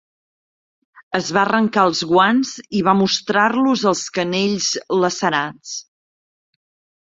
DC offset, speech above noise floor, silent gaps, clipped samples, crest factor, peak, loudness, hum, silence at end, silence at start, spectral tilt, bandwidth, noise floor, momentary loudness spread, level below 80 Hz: under 0.1%; over 72 dB; none; under 0.1%; 18 dB; -2 dBFS; -17 LUFS; none; 1.2 s; 1.1 s; -4 dB/octave; 7.8 kHz; under -90 dBFS; 8 LU; -62 dBFS